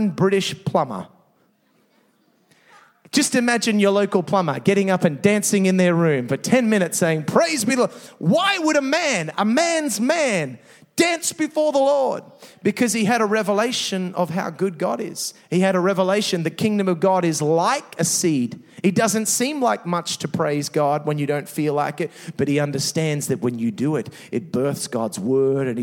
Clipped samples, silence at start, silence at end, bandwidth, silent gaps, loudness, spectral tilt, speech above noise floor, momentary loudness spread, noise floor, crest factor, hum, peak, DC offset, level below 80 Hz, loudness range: under 0.1%; 0 s; 0 s; 17 kHz; none; -20 LUFS; -4.5 dB/octave; 42 dB; 7 LU; -62 dBFS; 18 dB; none; -2 dBFS; under 0.1%; -70 dBFS; 4 LU